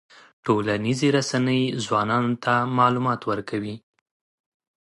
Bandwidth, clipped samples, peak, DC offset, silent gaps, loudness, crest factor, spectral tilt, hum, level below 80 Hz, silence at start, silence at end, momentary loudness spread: 11.5 kHz; under 0.1%; -4 dBFS; under 0.1%; none; -23 LUFS; 18 dB; -5.5 dB/octave; none; -62 dBFS; 0.45 s; 1.05 s; 10 LU